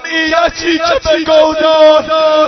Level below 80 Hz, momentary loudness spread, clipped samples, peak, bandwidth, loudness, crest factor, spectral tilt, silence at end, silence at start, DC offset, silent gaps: -38 dBFS; 5 LU; 0.2%; 0 dBFS; 6.4 kHz; -9 LUFS; 10 dB; -3 dB/octave; 0 s; 0 s; under 0.1%; none